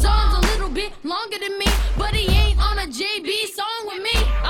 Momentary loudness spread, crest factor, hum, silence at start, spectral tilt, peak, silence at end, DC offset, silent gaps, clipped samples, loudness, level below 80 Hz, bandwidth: 8 LU; 14 dB; none; 0 s; -4 dB/octave; -6 dBFS; 0 s; under 0.1%; none; under 0.1%; -21 LUFS; -22 dBFS; 17 kHz